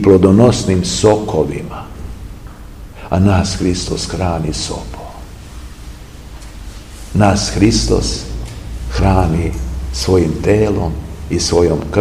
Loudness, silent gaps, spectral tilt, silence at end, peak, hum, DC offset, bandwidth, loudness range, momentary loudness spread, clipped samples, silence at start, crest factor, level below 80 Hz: -14 LUFS; none; -5.5 dB/octave; 0 s; 0 dBFS; none; 0.4%; 15 kHz; 6 LU; 21 LU; 0.2%; 0 s; 14 dB; -26 dBFS